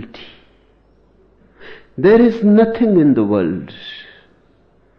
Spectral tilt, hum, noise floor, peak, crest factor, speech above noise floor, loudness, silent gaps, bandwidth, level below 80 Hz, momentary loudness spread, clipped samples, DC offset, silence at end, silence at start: -9.5 dB/octave; none; -54 dBFS; -2 dBFS; 14 dB; 41 dB; -13 LUFS; none; 5.6 kHz; -48 dBFS; 22 LU; under 0.1%; under 0.1%; 0.95 s; 0 s